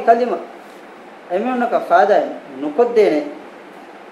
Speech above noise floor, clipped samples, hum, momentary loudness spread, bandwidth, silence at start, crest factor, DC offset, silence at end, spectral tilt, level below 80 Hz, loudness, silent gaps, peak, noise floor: 23 dB; under 0.1%; none; 24 LU; 12 kHz; 0 s; 18 dB; under 0.1%; 0 s; -5.5 dB/octave; -74 dBFS; -17 LUFS; none; 0 dBFS; -38 dBFS